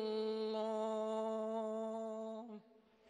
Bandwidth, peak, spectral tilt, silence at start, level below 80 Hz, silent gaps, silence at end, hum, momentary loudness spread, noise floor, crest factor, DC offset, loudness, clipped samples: 10 kHz; -30 dBFS; -6 dB/octave; 0 s; under -90 dBFS; none; 0 s; none; 10 LU; -67 dBFS; 12 dB; under 0.1%; -41 LUFS; under 0.1%